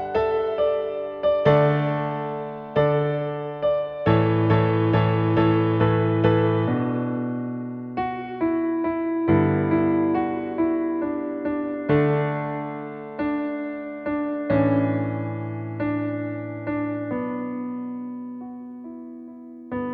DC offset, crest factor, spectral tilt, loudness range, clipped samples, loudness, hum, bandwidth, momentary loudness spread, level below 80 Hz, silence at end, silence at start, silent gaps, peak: under 0.1%; 20 dB; -10.5 dB/octave; 8 LU; under 0.1%; -23 LUFS; none; 5.2 kHz; 12 LU; -52 dBFS; 0 s; 0 s; none; -4 dBFS